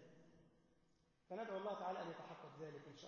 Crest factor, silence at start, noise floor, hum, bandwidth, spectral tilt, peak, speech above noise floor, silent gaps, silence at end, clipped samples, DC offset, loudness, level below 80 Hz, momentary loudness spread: 18 dB; 0 s; -79 dBFS; none; 7 kHz; -4 dB/octave; -34 dBFS; 29 dB; none; 0 s; under 0.1%; under 0.1%; -50 LUFS; -88 dBFS; 12 LU